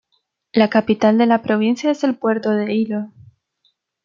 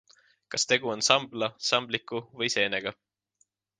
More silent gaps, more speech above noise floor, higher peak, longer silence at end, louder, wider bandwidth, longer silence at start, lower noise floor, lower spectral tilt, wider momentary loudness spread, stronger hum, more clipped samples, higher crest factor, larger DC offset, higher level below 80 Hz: neither; first, 52 dB vs 44 dB; about the same, -2 dBFS vs -4 dBFS; about the same, 0.95 s vs 0.85 s; first, -18 LUFS vs -27 LUFS; second, 7.2 kHz vs 11 kHz; about the same, 0.55 s vs 0.5 s; second, -68 dBFS vs -72 dBFS; first, -6.5 dB/octave vs -1.5 dB/octave; about the same, 8 LU vs 10 LU; neither; neither; second, 16 dB vs 26 dB; neither; first, -64 dBFS vs -70 dBFS